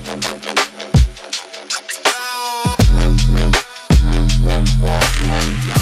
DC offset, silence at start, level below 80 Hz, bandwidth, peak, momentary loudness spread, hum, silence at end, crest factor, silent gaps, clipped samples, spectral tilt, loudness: under 0.1%; 0 s; -18 dBFS; 15.5 kHz; 0 dBFS; 8 LU; none; 0 s; 14 dB; none; under 0.1%; -4.5 dB/octave; -17 LUFS